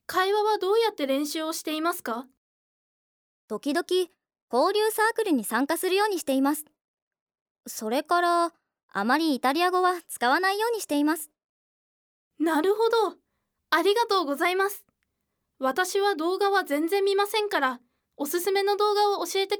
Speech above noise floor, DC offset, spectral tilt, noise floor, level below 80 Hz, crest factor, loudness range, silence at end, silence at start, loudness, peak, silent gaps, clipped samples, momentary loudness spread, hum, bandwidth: 55 dB; under 0.1%; -2 dB/octave; -80 dBFS; -80 dBFS; 18 dB; 3 LU; 0 s; 0.1 s; -25 LUFS; -10 dBFS; 2.37-3.48 s, 4.42-4.48 s, 6.81-7.11 s, 7.21-7.27 s, 7.41-7.55 s, 8.83-8.89 s, 11.44-12.31 s; under 0.1%; 8 LU; none; over 20 kHz